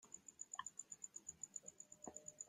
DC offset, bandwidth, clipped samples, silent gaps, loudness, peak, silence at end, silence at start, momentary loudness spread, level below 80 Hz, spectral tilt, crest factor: under 0.1%; 15.5 kHz; under 0.1%; none; -53 LUFS; -32 dBFS; 0 s; 0 s; 6 LU; -88 dBFS; -0.5 dB/octave; 24 dB